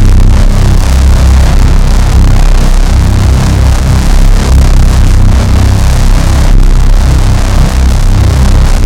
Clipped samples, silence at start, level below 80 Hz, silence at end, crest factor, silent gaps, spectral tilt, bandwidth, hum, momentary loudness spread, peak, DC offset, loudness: 20%; 0 s; -4 dBFS; 0 s; 4 dB; none; -6 dB/octave; 13.5 kHz; none; 2 LU; 0 dBFS; under 0.1%; -8 LUFS